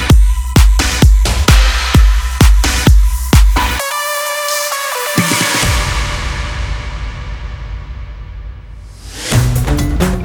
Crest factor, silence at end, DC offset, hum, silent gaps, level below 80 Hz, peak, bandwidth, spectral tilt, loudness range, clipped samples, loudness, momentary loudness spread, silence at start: 12 dB; 0 s; under 0.1%; none; none; -14 dBFS; 0 dBFS; over 20 kHz; -4 dB/octave; 10 LU; 0.2%; -13 LUFS; 17 LU; 0 s